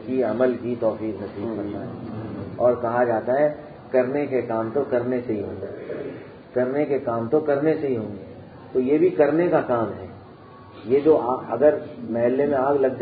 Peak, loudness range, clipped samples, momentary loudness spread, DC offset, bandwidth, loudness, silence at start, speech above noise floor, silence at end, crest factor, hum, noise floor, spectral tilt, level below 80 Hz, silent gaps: -6 dBFS; 3 LU; under 0.1%; 14 LU; under 0.1%; 4.9 kHz; -23 LUFS; 0 s; 22 dB; 0 s; 18 dB; none; -44 dBFS; -12 dB/octave; -56 dBFS; none